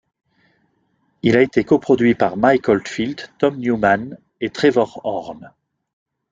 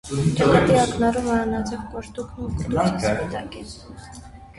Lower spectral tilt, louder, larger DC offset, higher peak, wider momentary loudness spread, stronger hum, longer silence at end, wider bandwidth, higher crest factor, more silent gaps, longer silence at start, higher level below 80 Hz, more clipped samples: about the same, -6.5 dB/octave vs -6 dB/octave; first, -18 LUFS vs -21 LUFS; neither; about the same, -2 dBFS vs -2 dBFS; second, 12 LU vs 22 LU; neither; first, 0.85 s vs 0.05 s; second, 7.8 kHz vs 11.5 kHz; about the same, 18 dB vs 20 dB; neither; first, 1.25 s vs 0.05 s; second, -54 dBFS vs -40 dBFS; neither